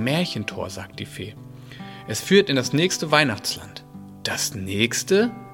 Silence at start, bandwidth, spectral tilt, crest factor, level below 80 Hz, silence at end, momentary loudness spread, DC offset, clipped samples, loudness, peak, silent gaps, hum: 0 s; 17 kHz; -4 dB/octave; 24 dB; -58 dBFS; 0 s; 21 LU; under 0.1%; under 0.1%; -22 LUFS; 0 dBFS; none; none